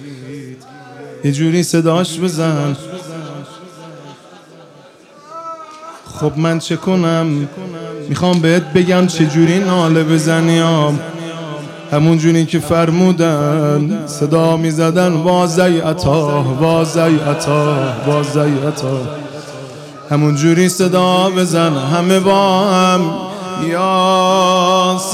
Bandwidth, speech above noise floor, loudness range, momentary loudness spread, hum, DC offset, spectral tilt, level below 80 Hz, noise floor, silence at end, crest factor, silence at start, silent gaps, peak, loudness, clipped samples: 15 kHz; 29 dB; 8 LU; 18 LU; none; under 0.1%; -6 dB/octave; -50 dBFS; -41 dBFS; 0 s; 14 dB; 0 s; none; 0 dBFS; -13 LUFS; under 0.1%